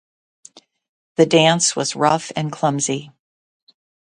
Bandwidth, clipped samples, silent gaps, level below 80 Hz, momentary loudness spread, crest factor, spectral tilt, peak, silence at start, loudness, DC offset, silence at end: 11 kHz; under 0.1%; none; -64 dBFS; 12 LU; 20 dB; -3.5 dB/octave; 0 dBFS; 1.2 s; -18 LUFS; under 0.1%; 1.1 s